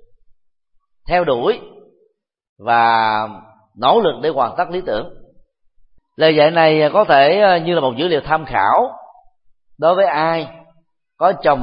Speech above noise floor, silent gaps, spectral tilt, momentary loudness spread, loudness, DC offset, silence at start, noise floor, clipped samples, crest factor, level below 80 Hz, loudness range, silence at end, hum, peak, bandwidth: 47 dB; 2.49-2.56 s; -10.5 dB/octave; 12 LU; -15 LUFS; under 0.1%; 1.05 s; -62 dBFS; under 0.1%; 16 dB; -46 dBFS; 5 LU; 0 s; none; 0 dBFS; 5.4 kHz